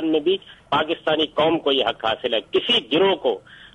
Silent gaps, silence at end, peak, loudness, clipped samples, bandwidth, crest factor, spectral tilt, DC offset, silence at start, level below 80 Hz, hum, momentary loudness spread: none; 0.1 s; -6 dBFS; -21 LUFS; under 0.1%; 9.4 kHz; 14 dB; -5.5 dB/octave; under 0.1%; 0 s; -58 dBFS; none; 6 LU